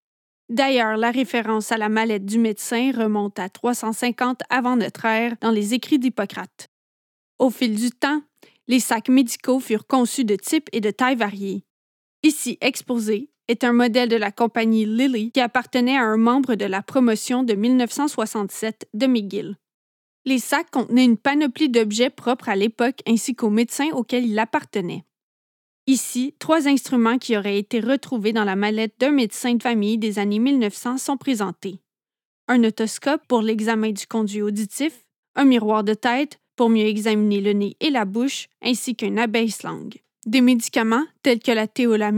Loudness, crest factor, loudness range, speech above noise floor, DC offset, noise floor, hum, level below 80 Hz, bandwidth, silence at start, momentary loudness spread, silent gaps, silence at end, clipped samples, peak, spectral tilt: -21 LUFS; 18 dB; 3 LU; over 70 dB; under 0.1%; under -90 dBFS; none; -86 dBFS; 18 kHz; 0.5 s; 8 LU; 6.68-7.39 s, 11.70-12.23 s, 19.74-20.25 s, 25.23-25.87 s, 32.25-32.48 s, 35.18-35.34 s, 36.54-36.58 s; 0 s; under 0.1%; -2 dBFS; -4 dB/octave